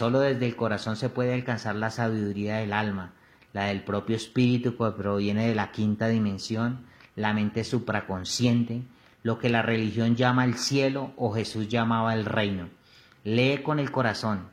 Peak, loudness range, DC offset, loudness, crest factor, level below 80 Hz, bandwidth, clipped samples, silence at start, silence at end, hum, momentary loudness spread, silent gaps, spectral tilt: -6 dBFS; 3 LU; under 0.1%; -27 LUFS; 20 dB; -62 dBFS; 13 kHz; under 0.1%; 0 s; 0.05 s; none; 7 LU; none; -6 dB/octave